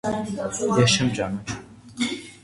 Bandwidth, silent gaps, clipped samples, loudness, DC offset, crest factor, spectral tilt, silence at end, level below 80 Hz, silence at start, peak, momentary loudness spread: 11.5 kHz; none; under 0.1%; -23 LUFS; under 0.1%; 18 dB; -4.5 dB/octave; 0.05 s; -50 dBFS; 0.05 s; -6 dBFS; 16 LU